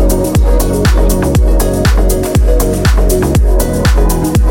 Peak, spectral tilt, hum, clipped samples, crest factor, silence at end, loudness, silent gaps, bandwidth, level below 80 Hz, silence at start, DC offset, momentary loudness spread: 0 dBFS; -6 dB/octave; none; under 0.1%; 8 dB; 0 s; -11 LUFS; none; 17 kHz; -10 dBFS; 0 s; under 0.1%; 1 LU